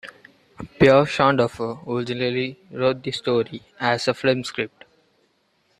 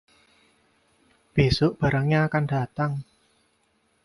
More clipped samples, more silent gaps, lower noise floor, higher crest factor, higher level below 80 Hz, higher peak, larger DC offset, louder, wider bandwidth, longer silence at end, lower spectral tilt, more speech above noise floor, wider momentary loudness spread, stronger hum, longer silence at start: neither; neither; about the same, -66 dBFS vs -68 dBFS; about the same, 20 dB vs 20 dB; second, -56 dBFS vs -46 dBFS; first, -2 dBFS vs -6 dBFS; neither; about the same, -22 LUFS vs -24 LUFS; about the same, 11.5 kHz vs 11.5 kHz; about the same, 1.1 s vs 1.05 s; second, -6 dB/octave vs -7.5 dB/octave; about the same, 44 dB vs 45 dB; first, 15 LU vs 7 LU; neither; second, 0.05 s vs 1.35 s